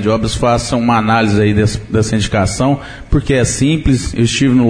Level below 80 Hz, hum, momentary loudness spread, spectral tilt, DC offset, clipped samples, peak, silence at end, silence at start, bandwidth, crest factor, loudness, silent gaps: -26 dBFS; none; 4 LU; -5.5 dB/octave; 0.3%; under 0.1%; -2 dBFS; 0 s; 0 s; 10.5 kHz; 10 dB; -14 LUFS; none